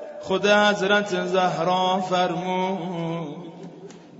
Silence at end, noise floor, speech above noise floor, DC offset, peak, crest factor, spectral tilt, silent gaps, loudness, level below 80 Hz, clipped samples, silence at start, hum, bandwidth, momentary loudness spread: 0 s; -43 dBFS; 20 dB; under 0.1%; -6 dBFS; 16 dB; -4.5 dB/octave; none; -22 LUFS; -68 dBFS; under 0.1%; 0 s; none; 8 kHz; 18 LU